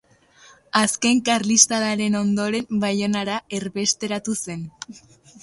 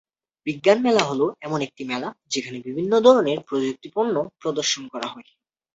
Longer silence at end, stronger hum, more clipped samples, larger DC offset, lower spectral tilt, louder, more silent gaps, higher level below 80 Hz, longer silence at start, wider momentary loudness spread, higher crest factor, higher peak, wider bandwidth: about the same, 0.45 s vs 0.55 s; neither; neither; neither; about the same, -3 dB/octave vs -4 dB/octave; about the same, -21 LUFS vs -22 LUFS; neither; first, -60 dBFS vs -66 dBFS; first, 0.75 s vs 0.45 s; about the same, 15 LU vs 14 LU; about the same, 22 dB vs 20 dB; about the same, 0 dBFS vs -2 dBFS; first, 11.5 kHz vs 8.2 kHz